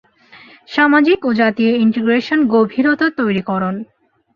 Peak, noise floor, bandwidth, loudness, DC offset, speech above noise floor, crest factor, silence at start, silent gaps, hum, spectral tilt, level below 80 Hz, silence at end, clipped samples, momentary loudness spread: -2 dBFS; -44 dBFS; 6.6 kHz; -15 LUFS; under 0.1%; 30 dB; 14 dB; 0.7 s; none; none; -7.5 dB/octave; -58 dBFS; 0.5 s; under 0.1%; 8 LU